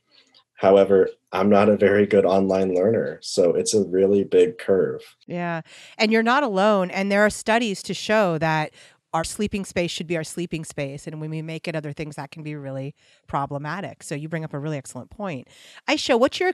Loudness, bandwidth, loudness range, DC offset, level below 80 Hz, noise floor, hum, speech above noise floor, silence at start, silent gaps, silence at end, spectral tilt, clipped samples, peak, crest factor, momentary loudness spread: -22 LUFS; 13 kHz; 12 LU; under 0.1%; -56 dBFS; -57 dBFS; none; 36 dB; 0.6 s; none; 0 s; -5 dB/octave; under 0.1%; -4 dBFS; 18 dB; 15 LU